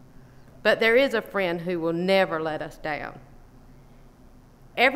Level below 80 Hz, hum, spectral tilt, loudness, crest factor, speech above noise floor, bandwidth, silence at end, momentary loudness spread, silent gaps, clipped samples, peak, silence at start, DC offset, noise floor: -52 dBFS; none; -5.5 dB/octave; -24 LUFS; 20 dB; 27 dB; 16 kHz; 0 s; 13 LU; none; under 0.1%; -6 dBFS; 0.6 s; under 0.1%; -51 dBFS